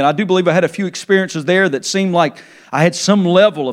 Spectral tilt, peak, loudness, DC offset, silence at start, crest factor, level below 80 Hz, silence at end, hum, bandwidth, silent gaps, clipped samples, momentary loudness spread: -5 dB/octave; 0 dBFS; -14 LUFS; under 0.1%; 0 s; 14 dB; -68 dBFS; 0 s; none; 13 kHz; none; under 0.1%; 7 LU